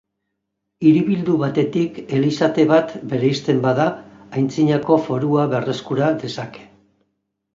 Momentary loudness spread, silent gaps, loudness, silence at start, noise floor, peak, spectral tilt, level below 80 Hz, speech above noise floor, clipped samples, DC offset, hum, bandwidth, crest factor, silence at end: 9 LU; none; -19 LUFS; 0.8 s; -77 dBFS; -2 dBFS; -7.5 dB/octave; -60 dBFS; 59 dB; under 0.1%; under 0.1%; none; 7.6 kHz; 16 dB; 0.9 s